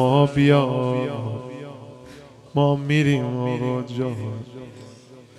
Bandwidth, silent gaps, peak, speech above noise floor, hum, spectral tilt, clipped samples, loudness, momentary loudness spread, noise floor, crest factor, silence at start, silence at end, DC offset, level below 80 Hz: 10.5 kHz; none; -4 dBFS; 25 dB; none; -7.5 dB/octave; under 0.1%; -22 LUFS; 22 LU; -45 dBFS; 18 dB; 0 s; 0.15 s; under 0.1%; -56 dBFS